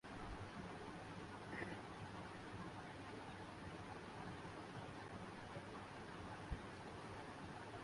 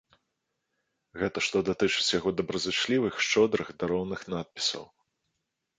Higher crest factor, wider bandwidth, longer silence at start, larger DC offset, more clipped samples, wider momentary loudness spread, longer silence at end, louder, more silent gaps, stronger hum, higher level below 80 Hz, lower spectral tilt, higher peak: about the same, 18 dB vs 20 dB; first, 11.5 kHz vs 9.6 kHz; second, 0.05 s vs 1.15 s; neither; neither; second, 2 LU vs 9 LU; second, 0 s vs 0.95 s; second, -53 LUFS vs -28 LUFS; neither; neither; about the same, -64 dBFS vs -60 dBFS; first, -5.5 dB/octave vs -3.5 dB/octave; second, -34 dBFS vs -10 dBFS